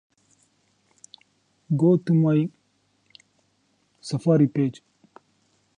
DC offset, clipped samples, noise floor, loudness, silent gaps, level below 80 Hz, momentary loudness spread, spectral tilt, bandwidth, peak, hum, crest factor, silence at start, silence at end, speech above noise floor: under 0.1%; under 0.1%; -68 dBFS; -22 LUFS; none; -70 dBFS; 12 LU; -8.5 dB/octave; 10 kHz; -8 dBFS; none; 18 dB; 1.7 s; 1.05 s; 47 dB